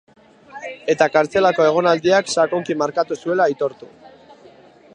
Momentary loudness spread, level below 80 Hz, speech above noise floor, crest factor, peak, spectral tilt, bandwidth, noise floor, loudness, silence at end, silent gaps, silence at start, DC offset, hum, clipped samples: 10 LU; -62 dBFS; 29 dB; 18 dB; -2 dBFS; -4.5 dB/octave; 10.5 kHz; -47 dBFS; -18 LUFS; 0.85 s; none; 0.55 s; under 0.1%; none; under 0.1%